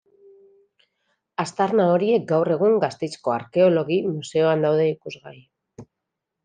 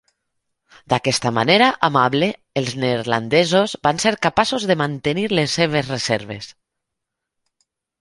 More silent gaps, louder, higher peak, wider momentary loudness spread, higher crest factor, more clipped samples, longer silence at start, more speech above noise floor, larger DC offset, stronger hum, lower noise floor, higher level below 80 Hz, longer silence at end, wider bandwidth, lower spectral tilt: neither; second, -21 LUFS vs -18 LUFS; second, -6 dBFS vs 0 dBFS; first, 11 LU vs 8 LU; about the same, 16 dB vs 20 dB; neither; first, 1.4 s vs 0.9 s; about the same, 62 dB vs 62 dB; neither; neither; about the same, -82 dBFS vs -81 dBFS; second, -72 dBFS vs -54 dBFS; second, 0.6 s vs 1.5 s; second, 9.6 kHz vs 11.5 kHz; first, -6.5 dB/octave vs -4.5 dB/octave